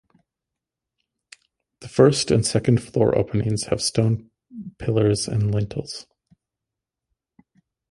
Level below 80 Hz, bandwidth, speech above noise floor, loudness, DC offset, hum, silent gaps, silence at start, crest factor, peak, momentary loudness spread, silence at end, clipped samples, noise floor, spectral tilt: -48 dBFS; 11.5 kHz; 66 dB; -21 LUFS; under 0.1%; none; none; 1.8 s; 22 dB; -2 dBFS; 17 LU; 1.9 s; under 0.1%; -86 dBFS; -5.5 dB/octave